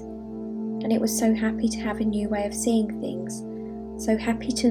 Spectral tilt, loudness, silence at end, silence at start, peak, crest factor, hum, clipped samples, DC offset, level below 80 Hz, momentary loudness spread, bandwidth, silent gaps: -4.5 dB/octave; -26 LUFS; 0 s; 0 s; -10 dBFS; 16 dB; none; under 0.1%; under 0.1%; -48 dBFS; 12 LU; 18 kHz; none